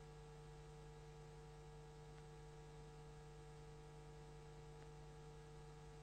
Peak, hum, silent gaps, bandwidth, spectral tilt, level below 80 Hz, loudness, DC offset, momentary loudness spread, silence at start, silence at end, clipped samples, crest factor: -46 dBFS; 60 Hz at -75 dBFS; none; 10 kHz; -6 dB/octave; -64 dBFS; -60 LUFS; under 0.1%; 0 LU; 0 s; 0 s; under 0.1%; 12 dB